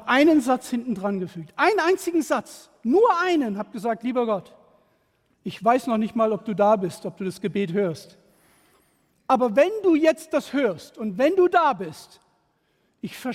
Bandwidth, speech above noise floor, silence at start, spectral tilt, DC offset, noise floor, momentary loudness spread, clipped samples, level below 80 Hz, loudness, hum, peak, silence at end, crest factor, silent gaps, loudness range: 16 kHz; 46 dB; 0 s; -5.5 dB/octave; under 0.1%; -68 dBFS; 13 LU; under 0.1%; -66 dBFS; -23 LUFS; none; -6 dBFS; 0 s; 18 dB; none; 4 LU